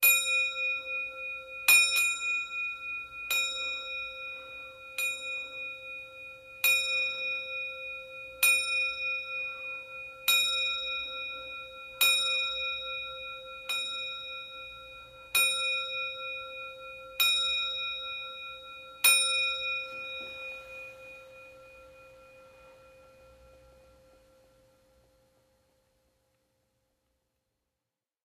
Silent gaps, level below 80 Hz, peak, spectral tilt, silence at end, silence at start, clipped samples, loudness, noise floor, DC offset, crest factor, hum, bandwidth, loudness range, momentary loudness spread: none; -68 dBFS; -8 dBFS; 2.5 dB/octave; 4.75 s; 0 s; under 0.1%; -28 LUFS; -89 dBFS; under 0.1%; 26 dB; none; 15.5 kHz; 7 LU; 18 LU